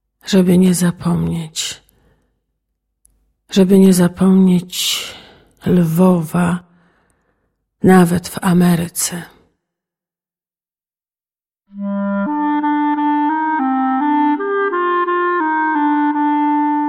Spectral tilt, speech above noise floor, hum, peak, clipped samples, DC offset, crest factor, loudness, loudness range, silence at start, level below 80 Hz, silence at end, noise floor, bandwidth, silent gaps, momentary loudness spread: -5.5 dB/octave; over 77 dB; none; 0 dBFS; under 0.1%; under 0.1%; 16 dB; -15 LUFS; 7 LU; 0.25 s; -50 dBFS; 0 s; under -90 dBFS; 16 kHz; none; 10 LU